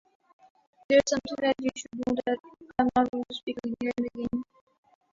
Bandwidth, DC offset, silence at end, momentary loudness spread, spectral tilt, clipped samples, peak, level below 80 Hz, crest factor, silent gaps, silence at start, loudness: 7.6 kHz; under 0.1%; 0.7 s; 11 LU; -4 dB/octave; under 0.1%; -10 dBFS; -60 dBFS; 20 dB; 3.09-3.13 s, 3.43-3.47 s; 0.9 s; -29 LUFS